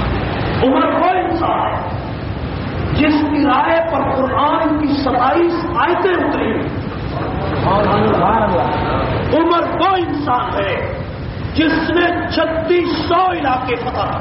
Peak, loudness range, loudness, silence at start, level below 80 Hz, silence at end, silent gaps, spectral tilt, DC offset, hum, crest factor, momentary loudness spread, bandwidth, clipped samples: -4 dBFS; 2 LU; -16 LUFS; 0 s; -32 dBFS; 0 s; none; -4.5 dB/octave; under 0.1%; none; 12 dB; 9 LU; 5.8 kHz; under 0.1%